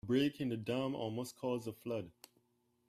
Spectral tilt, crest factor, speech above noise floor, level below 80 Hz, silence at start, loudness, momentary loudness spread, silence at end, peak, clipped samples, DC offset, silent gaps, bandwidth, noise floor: -6 dB/octave; 18 dB; 40 dB; -74 dBFS; 0.05 s; -39 LUFS; 9 LU; 0.8 s; -22 dBFS; under 0.1%; under 0.1%; none; 14.5 kHz; -78 dBFS